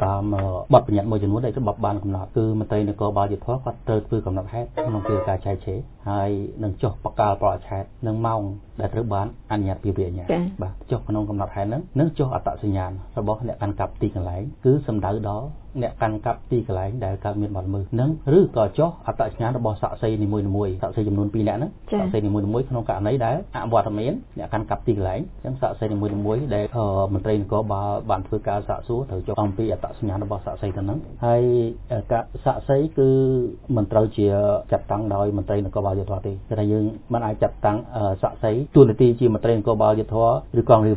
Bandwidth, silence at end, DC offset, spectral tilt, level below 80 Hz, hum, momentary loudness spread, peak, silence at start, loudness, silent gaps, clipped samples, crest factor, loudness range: 4 kHz; 0 s; under 0.1%; -12.5 dB/octave; -38 dBFS; none; 9 LU; 0 dBFS; 0 s; -23 LUFS; none; under 0.1%; 22 dB; 5 LU